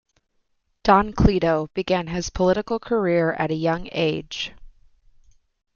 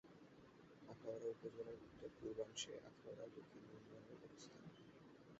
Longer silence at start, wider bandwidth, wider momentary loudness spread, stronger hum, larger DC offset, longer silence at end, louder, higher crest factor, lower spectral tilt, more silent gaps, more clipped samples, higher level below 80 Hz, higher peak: first, 0.85 s vs 0.05 s; about the same, 7.2 kHz vs 7.6 kHz; second, 10 LU vs 15 LU; neither; neither; first, 1.1 s vs 0 s; first, -22 LUFS vs -55 LUFS; about the same, 20 dB vs 22 dB; first, -6 dB/octave vs -4 dB/octave; neither; neither; first, -38 dBFS vs -82 dBFS; first, -2 dBFS vs -34 dBFS